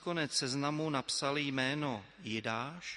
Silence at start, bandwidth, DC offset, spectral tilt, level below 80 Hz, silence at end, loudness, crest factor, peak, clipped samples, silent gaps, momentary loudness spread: 0 s; 11.5 kHz; under 0.1%; -3.5 dB/octave; -72 dBFS; 0 s; -35 LUFS; 20 dB; -16 dBFS; under 0.1%; none; 6 LU